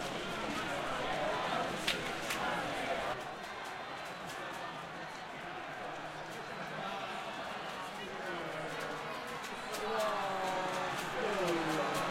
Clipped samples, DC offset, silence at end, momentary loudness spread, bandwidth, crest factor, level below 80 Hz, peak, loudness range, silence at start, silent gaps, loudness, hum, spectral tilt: under 0.1%; under 0.1%; 0 s; 9 LU; 16.5 kHz; 20 dB; -64 dBFS; -18 dBFS; 6 LU; 0 s; none; -38 LUFS; none; -3.5 dB/octave